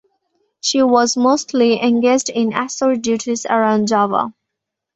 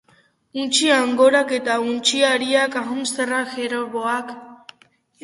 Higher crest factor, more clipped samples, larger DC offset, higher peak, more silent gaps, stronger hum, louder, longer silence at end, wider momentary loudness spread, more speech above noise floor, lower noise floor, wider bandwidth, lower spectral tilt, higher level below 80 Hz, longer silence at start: about the same, 16 dB vs 18 dB; neither; neither; first, 0 dBFS vs -4 dBFS; neither; neither; first, -16 LUFS vs -19 LUFS; about the same, 0.65 s vs 0.7 s; second, 6 LU vs 11 LU; first, 65 dB vs 39 dB; first, -80 dBFS vs -58 dBFS; second, 8.2 kHz vs 11.5 kHz; first, -3.5 dB/octave vs -1.5 dB/octave; first, -60 dBFS vs -70 dBFS; about the same, 0.65 s vs 0.55 s